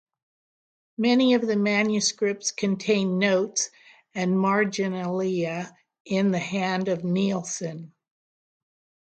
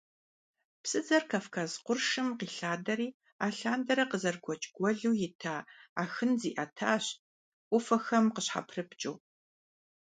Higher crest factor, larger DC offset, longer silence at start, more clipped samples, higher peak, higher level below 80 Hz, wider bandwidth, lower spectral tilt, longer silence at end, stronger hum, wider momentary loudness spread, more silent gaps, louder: about the same, 18 dB vs 20 dB; neither; first, 1 s vs 0.85 s; neither; first, -8 dBFS vs -12 dBFS; first, -72 dBFS vs -80 dBFS; about the same, 9.2 kHz vs 9.4 kHz; about the same, -4.5 dB/octave vs -4 dB/octave; first, 1.2 s vs 0.95 s; neither; about the same, 10 LU vs 10 LU; second, 6.00-6.05 s vs 3.14-3.20 s, 3.32-3.39 s, 5.35-5.39 s, 5.89-5.96 s, 7.19-7.71 s; first, -24 LUFS vs -33 LUFS